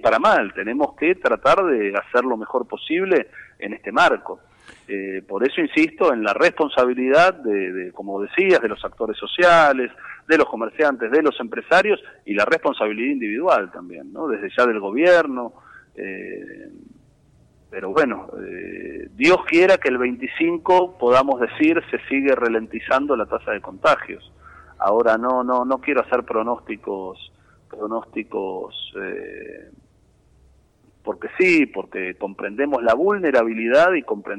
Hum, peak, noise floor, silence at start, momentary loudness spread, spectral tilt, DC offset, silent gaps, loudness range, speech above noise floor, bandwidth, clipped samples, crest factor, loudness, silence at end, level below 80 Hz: none; -6 dBFS; -57 dBFS; 0.05 s; 17 LU; -5 dB/octave; under 0.1%; none; 10 LU; 37 dB; 10.5 kHz; under 0.1%; 14 dB; -19 LUFS; 0 s; -56 dBFS